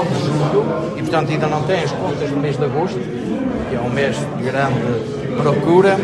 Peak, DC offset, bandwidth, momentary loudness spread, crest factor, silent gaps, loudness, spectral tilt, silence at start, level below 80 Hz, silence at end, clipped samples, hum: -2 dBFS; under 0.1%; 11.5 kHz; 6 LU; 16 dB; none; -18 LUFS; -7 dB/octave; 0 s; -46 dBFS; 0 s; under 0.1%; none